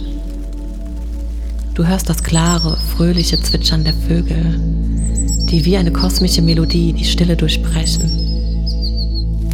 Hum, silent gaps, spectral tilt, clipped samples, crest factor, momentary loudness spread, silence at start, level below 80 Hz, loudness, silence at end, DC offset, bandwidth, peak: none; none; -5 dB/octave; under 0.1%; 14 dB; 12 LU; 0 s; -18 dBFS; -16 LUFS; 0 s; under 0.1%; 16 kHz; 0 dBFS